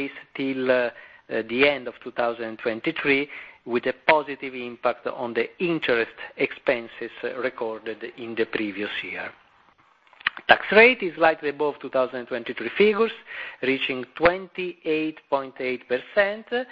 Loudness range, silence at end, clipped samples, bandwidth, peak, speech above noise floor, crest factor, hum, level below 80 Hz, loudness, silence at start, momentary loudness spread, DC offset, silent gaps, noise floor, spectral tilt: 7 LU; 0.05 s; under 0.1%; 5.4 kHz; 0 dBFS; 34 dB; 24 dB; none; -60 dBFS; -24 LUFS; 0 s; 12 LU; under 0.1%; none; -59 dBFS; -7 dB/octave